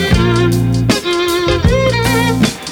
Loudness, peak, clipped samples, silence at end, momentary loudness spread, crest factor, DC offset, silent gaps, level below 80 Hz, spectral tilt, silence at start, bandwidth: -13 LUFS; 0 dBFS; under 0.1%; 0 s; 2 LU; 12 dB; under 0.1%; none; -24 dBFS; -5.5 dB/octave; 0 s; 17.5 kHz